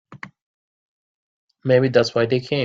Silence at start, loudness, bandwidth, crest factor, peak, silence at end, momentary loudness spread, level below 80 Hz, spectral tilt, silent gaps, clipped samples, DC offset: 0.1 s; -18 LUFS; 7.6 kHz; 20 dB; -2 dBFS; 0 s; 22 LU; -60 dBFS; -6.5 dB/octave; 0.42-1.48 s; under 0.1%; under 0.1%